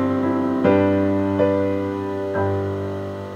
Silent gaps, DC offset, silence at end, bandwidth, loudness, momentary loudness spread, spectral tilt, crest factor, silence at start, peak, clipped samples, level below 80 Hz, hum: none; under 0.1%; 0 s; 8.2 kHz; -21 LUFS; 8 LU; -9 dB/octave; 16 dB; 0 s; -4 dBFS; under 0.1%; -60 dBFS; none